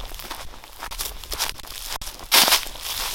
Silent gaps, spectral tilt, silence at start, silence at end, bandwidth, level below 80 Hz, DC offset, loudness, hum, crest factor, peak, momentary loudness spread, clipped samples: none; 0.5 dB/octave; 0 s; 0 s; 17 kHz; -40 dBFS; under 0.1%; -21 LUFS; none; 26 dB; 0 dBFS; 21 LU; under 0.1%